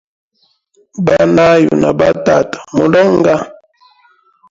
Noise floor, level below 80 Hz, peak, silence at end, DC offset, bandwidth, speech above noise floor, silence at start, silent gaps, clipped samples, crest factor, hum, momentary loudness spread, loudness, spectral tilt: -59 dBFS; -44 dBFS; 0 dBFS; 1 s; under 0.1%; 7.8 kHz; 48 dB; 0.95 s; none; under 0.1%; 12 dB; none; 9 LU; -11 LUFS; -6.5 dB/octave